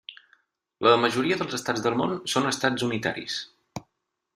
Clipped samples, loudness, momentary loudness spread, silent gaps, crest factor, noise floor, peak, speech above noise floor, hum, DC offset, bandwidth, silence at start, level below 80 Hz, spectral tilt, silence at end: under 0.1%; -25 LUFS; 21 LU; none; 22 dB; -79 dBFS; -6 dBFS; 54 dB; none; under 0.1%; 15 kHz; 0.1 s; -66 dBFS; -4 dB/octave; 0.55 s